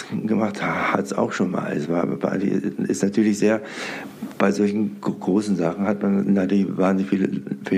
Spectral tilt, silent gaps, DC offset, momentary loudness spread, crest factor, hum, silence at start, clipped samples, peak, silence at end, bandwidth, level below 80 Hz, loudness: -6.5 dB/octave; none; under 0.1%; 6 LU; 18 dB; none; 0 s; under 0.1%; -4 dBFS; 0 s; 12.5 kHz; -68 dBFS; -22 LUFS